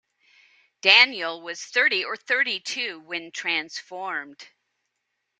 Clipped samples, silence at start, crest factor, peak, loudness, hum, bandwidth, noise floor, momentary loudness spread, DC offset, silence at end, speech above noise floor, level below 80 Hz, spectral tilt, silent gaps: under 0.1%; 0.85 s; 26 dB; -2 dBFS; -22 LUFS; none; 13.5 kHz; -79 dBFS; 18 LU; under 0.1%; 0.95 s; 54 dB; -82 dBFS; 0 dB/octave; none